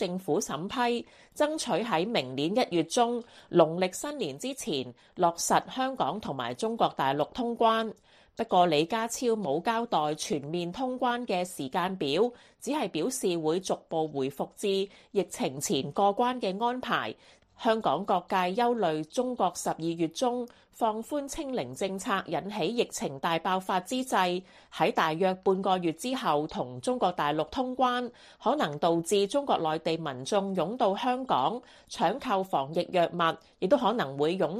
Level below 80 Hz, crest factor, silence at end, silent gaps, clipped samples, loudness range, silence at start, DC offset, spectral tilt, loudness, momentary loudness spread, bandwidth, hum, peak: -64 dBFS; 20 dB; 0 s; none; under 0.1%; 3 LU; 0 s; under 0.1%; -4.5 dB/octave; -29 LUFS; 8 LU; 15 kHz; none; -8 dBFS